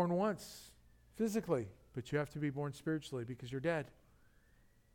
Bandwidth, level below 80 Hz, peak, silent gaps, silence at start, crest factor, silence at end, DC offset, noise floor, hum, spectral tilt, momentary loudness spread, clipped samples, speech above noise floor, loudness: 17.5 kHz; -68 dBFS; -22 dBFS; none; 0 s; 18 dB; 1.05 s; under 0.1%; -68 dBFS; none; -6.5 dB/octave; 16 LU; under 0.1%; 30 dB; -40 LUFS